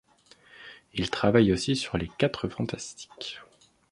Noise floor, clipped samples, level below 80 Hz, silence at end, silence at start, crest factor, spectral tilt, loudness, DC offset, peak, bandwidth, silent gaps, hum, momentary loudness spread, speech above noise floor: -58 dBFS; under 0.1%; -50 dBFS; 0.5 s; 0.6 s; 22 dB; -5.5 dB/octave; -28 LUFS; under 0.1%; -8 dBFS; 11.5 kHz; none; none; 23 LU; 31 dB